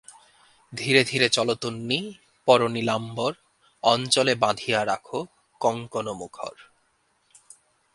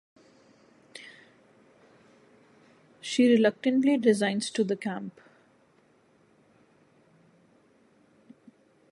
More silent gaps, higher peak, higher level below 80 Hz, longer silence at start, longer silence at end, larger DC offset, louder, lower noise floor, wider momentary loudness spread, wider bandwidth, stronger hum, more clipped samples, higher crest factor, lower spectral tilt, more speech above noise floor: neither; first, -2 dBFS vs -10 dBFS; first, -66 dBFS vs -82 dBFS; second, 0.7 s vs 0.95 s; second, 1.35 s vs 3.8 s; neither; about the same, -24 LUFS vs -25 LUFS; first, -68 dBFS vs -64 dBFS; second, 17 LU vs 24 LU; about the same, 11.5 kHz vs 11.5 kHz; neither; neither; about the same, 24 dB vs 20 dB; second, -3.5 dB/octave vs -5 dB/octave; first, 44 dB vs 39 dB